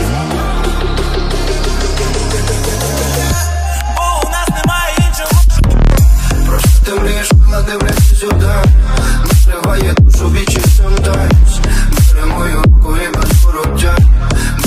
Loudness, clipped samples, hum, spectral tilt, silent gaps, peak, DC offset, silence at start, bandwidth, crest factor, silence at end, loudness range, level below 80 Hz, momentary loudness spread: -12 LUFS; under 0.1%; none; -5 dB/octave; none; 0 dBFS; under 0.1%; 0 s; 15.5 kHz; 10 dB; 0 s; 4 LU; -10 dBFS; 6 LU